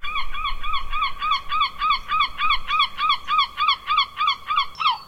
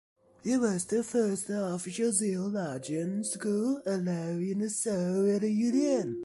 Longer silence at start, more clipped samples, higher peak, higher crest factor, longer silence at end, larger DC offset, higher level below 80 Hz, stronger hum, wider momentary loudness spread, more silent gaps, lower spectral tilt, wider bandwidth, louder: second, 0 s vs 0.45 s; neither; first, -8 dBFS vs -12 dBFS; about the same, 14 dB vs 16 dB; about the same, 0 s vs 0 s; neither; first, -36 dBFS vs -72 dBFS; neither; about the same, 7 LU vs 6 LU; neither; second, -1 dB/octave vs -5.5 dB/octave; first, 13 kHz vs 11.5 kHz; first, -22 LUFS vs -30 LUFS